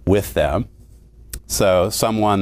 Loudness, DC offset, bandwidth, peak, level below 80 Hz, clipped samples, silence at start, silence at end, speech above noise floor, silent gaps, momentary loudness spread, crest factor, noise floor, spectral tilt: -18 LUFS; under 0.1%; 16 kHz; -4 dBFS; -36 dBFS; under 0.1%; 0.05 s; 0 s; 27 dB; none; 18 LU; 16 dB; -44 dBFS; -5 dB/octave